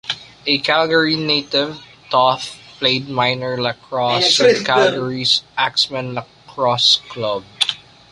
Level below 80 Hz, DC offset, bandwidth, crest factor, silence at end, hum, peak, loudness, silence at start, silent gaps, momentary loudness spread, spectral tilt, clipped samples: -58 dBFS; under 0.1%; 11.5 kHz; 18 dB; 0.35 s; none; 0 dBFS; -16 LUFS; 0.05 s; none; 12 LU; -3 dB/octave; under 0.1%